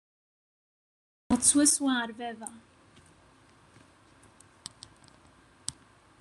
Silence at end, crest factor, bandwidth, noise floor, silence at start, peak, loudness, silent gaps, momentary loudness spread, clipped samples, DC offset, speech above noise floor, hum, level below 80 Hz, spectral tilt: 0.5 s; 26 dB; 12.5 kHz; -60 dBFS; 1.3 s; -6 dBFS; -26 LUFS; none; 25 LU; under 0.1%; under 0.1%; 33 dB; none; -62 dBFS; -1.5 dB/octave